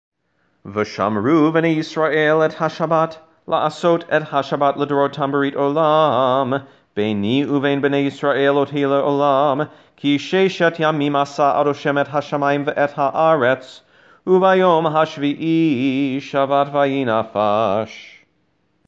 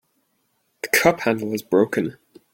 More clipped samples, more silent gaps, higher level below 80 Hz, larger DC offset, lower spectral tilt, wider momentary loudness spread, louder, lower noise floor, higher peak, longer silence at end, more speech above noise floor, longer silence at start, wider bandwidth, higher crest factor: neither; neither; second, -68 dBFS vs -58 dBFS; neither; first, -6.5 dB/octave vs -4.5 dB/octave; second, 7 LU vs 11 LU; about the same, -18 LUFS vs -20 LUFS; second, -65 dBFS vs -69 dBFS; about the same, -2 dBFS vs -2 dBFS; first, 0.8 s vs 0.4 s; about the same, 48 dB vs 49 dB; second, 0.65 s vs 0.85 s; second, 8 kHz vs 17 kHz; second, 16 dB vs 22 dB